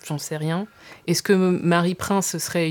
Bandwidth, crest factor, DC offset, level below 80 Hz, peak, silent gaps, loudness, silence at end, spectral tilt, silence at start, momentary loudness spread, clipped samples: 19 kHz; 18 dB; under 0.1%; -60 dBFS; -4 dBFS; none; -22 LUFS; 0 s; -5 dB/octave; 0.05 s; 10 LU; under 0.1%